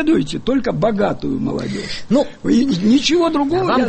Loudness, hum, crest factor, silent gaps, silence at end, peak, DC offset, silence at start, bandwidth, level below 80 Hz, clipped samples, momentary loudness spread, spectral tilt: -17 LUFS; none; 12 dB; none; 0 s; -4 dBFS; under 0.1%; 0 s; 8.8 kHz; -40 dBFS; under 0.1%; 8 LU; -5.5 dB/octave